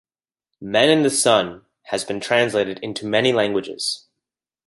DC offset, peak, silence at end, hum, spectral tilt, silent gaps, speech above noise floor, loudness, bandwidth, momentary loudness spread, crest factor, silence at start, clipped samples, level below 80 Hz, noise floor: under 0.1%; -2 dBFS; 0.7 s; none; -3 dB/octave; none; 65 dB; -19 LUFS; 12 kHz; 12 LU; 20 dB; 0.6 s; under 0.1%; -62 dBFS; -84 dBFS